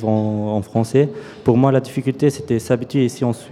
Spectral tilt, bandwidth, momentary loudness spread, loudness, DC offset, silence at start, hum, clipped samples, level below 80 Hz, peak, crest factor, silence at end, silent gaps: -7.5 dB/octave; 14.5 kHz; 7 LU; -19 LUFS; under 0.1%; 0 s; none; under 0.1%; -52 dBFS; 0 dBFS; 18 dB; 0 s; none